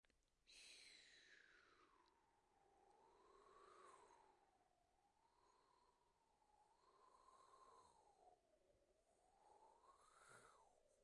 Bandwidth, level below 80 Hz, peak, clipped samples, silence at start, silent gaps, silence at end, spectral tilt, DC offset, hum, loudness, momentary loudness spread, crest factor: 11 kHz; under -90 dBFS; -52 dBFS; under 0.1%; 0.05 s; none; 0 s; -1.5 dB/octave; under 0.1%; none; -67 LUFS; 6 LU; 22 dB